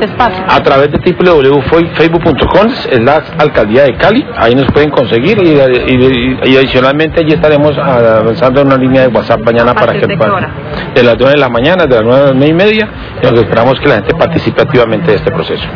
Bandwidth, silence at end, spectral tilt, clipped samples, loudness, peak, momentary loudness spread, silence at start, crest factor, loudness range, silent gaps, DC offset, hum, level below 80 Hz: 5.4 kHz; 0 s; -8 dB/octave; 5%; -8 LUFS; 0 dBFS; 4 LU; 0 s; 8 dB; 1 LU; none; 0.3%; none; -30 dBFS